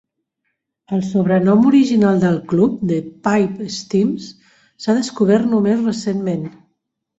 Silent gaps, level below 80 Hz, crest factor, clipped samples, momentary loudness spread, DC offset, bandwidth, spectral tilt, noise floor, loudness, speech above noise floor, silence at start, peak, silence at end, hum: none; -56 dBFS; 14 dB; under 0.1%; 12 LU; under 0.1%; 8 kHz; -7 dB/octave; -73 dBFS; -17 LUFS; 58 dB; 0.9 s; -4 dBFS; 0.7 s; none